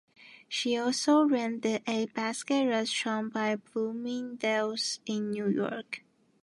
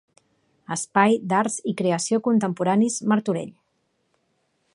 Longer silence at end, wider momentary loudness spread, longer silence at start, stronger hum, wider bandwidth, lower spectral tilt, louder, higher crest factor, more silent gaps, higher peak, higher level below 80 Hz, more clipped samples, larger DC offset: second, 0.45 s vs 1.25 s; about the same, 10 LU vs 10 LU; second, 0.2 s vs 0.7 s; neither; about the same, 11.5 kHz vs 11.5 kHz; second, -3.5 dB/octave vs -5 dB/octave; second, -30 LUFS vs -22 LUFS; about the same, 16 dB vs 20 dB; neither; second, -14 dBFS vs -2 dBFS; second, -82 dBFS vs -72 dBFS; neither; neither